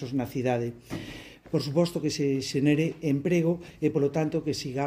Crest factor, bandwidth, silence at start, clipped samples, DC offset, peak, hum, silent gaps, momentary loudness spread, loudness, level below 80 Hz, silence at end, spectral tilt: 16 dB; 16 kHz; 0 s; under 0.1%; under 0.1%; -12 dBFS; none; none; 12 LU; -27 LUFS; -58 dBFS; 0 s; -6.5 dB/octave